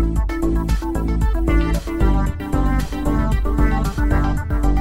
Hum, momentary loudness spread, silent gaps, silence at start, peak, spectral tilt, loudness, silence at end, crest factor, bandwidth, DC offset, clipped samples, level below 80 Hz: none; 3 LU; none; 0 s; -4 dBFS; -7.5 dB/octave; -20 LUFS; 0 s; 14 dB; 13 kHz; under 0.1%; under 0.1%; -20 dBFS